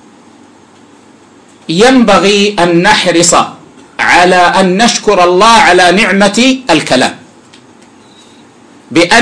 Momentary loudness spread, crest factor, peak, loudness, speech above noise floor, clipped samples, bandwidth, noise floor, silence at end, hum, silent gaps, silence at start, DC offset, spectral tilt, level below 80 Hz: 7 LU; 8 dB; 0 dBFS; -7 LUFS; 33 dB; 0.2%; 11 kHz; -39 dBFS; 0 s; none; none; 1.7 s; under 0.1%; -3.5 dB/octave; -40 dBFS